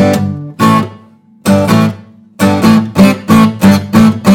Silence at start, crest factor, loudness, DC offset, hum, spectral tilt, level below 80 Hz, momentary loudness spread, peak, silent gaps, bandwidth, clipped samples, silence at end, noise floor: 0 s; 8 dB; -9 LUFS; under 0.1%; none; -6.5 dB/octave; -42 dBFS; 9 LU; 0 dBFS; none; 16.5 kHz; 2%; 0 s; -40 dBFS